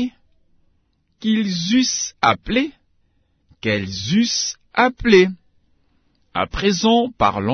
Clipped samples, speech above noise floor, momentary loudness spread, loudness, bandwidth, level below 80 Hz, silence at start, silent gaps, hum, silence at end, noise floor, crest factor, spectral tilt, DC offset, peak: under 0.1%; 46 dB; 13 LU; -19 LUFS; 6.6 kHz; -44 dBFS; 0 s; none; none; 0 s; -64 dBFS; 18 dB; -4 dB/octave; under 0.1%; -2 dBFS